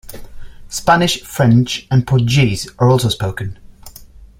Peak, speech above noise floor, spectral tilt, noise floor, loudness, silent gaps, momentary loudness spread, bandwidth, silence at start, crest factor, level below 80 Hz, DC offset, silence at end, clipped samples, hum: 0 dBFS; 25 dB; -5.5 dB/octave; -39 dBFS; -15 LUFS; none; 10 LU; 16.5 kHz; 0.1 s; 16 dB; -38 dBFS; under 0.1%; 0.15 s; under 0.1%; none